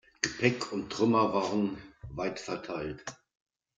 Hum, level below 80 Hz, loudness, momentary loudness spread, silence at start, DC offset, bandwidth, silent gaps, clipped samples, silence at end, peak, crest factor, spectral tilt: none; -60 dBFS; -31 LUFS; 17 LU; 0.25 s; under 0.1%; 9.4 kHz; none; under 0.1%; 0.65 s; -10 dBFS; 22 dB; -5 dB/octave